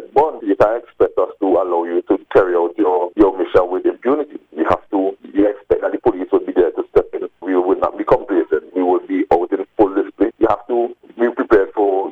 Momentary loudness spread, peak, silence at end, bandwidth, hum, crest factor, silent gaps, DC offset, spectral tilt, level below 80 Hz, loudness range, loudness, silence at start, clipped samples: 5 LU; -2 dBFS; 0 s; 5.6 kHz; none; 16 dB; none; under 0.1%; -8 dB/octave; -44 dBFS; 2 LU; -17 LUFS; 0 s; under 0.1%